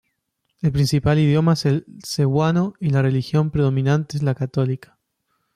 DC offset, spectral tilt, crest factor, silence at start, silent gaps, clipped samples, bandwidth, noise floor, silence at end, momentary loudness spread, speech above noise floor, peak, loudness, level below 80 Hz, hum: under 0.1%; -7 dB/octave; 12 dB; 0.65 s; none; under 0.1%; 13.5 kHz; -74 dBFS; 0.8 s; 7 LU; 55 dB; -8 dBFS; -20 LUFS; -46 dBFS; none